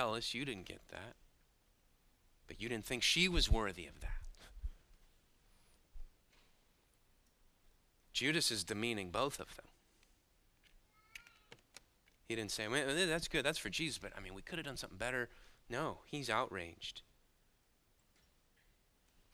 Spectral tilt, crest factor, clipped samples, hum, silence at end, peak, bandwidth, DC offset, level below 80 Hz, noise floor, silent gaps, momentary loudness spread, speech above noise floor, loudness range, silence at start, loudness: -3 dB/octave; 24 dB; under 0.1%; none; 2.3 s; -18 dBFS; 16 kHz; under 0.1%; -50 dBFS; -74 dBFS; none; 20 LU; 35 dB; 11 LU; 0 s; -38 LUFS